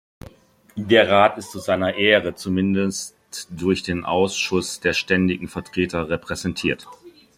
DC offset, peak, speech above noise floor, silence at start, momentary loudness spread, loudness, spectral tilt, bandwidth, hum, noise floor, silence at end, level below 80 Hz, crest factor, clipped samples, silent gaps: under 0.1%; -2 dBFS; 27 dB; 0.25 s; 14 LU; -21 LUFS; -4.5 dB/octave; 15.5 kHz; none; -48 dBFS; 0.3 s; -54 dBFS; 20 dB; under 0.1%; none